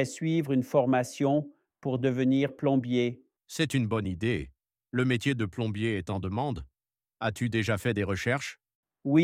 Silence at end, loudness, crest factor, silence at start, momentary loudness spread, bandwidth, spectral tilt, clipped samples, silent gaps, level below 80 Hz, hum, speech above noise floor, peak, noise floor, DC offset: 0 s; -29 LUFS; 18 dB; 0 s; 9 LU; 15.5 kHz; -6.5 dB/octave; under 0.1%; 8.75-8.83 s; -58 dBFS; none; over 62 dB; -10 dBFS; under -90 dBFS; under 0.1%